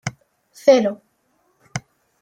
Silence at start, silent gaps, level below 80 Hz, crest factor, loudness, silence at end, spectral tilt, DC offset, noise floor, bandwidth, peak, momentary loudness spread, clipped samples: 0.05 s; none; -60 dBFS; 20 dB; -17 LUFS; 0.4 s; -5 dB/octave; under 0.1%; -65 dBFS; 13.5 kHz; -2 dBFS; 18 LU; under 0.1%